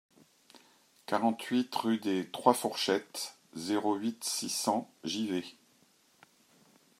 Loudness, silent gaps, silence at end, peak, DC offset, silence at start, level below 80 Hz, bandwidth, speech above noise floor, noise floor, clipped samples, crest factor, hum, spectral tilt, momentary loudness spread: -32 LUFS; none; 1.5 s; -8 dBFS; under 0.1%; 1.1 s; -84 dBFS; 16 kHz; 35 dB; -67 dBFS; under 0.1%; 26 dB; none; -3.5 dB/octave; 11 LU